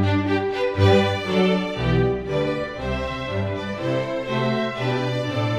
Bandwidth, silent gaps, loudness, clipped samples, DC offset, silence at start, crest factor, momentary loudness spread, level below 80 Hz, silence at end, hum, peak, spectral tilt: 10.5 kHz; none; -22 LUFS; under 0.1%; under 0.1%; 0 s; 18 dB; 8 LU; -40 dBFS; 0 s; none; -4 dBFS; -7 dB/octave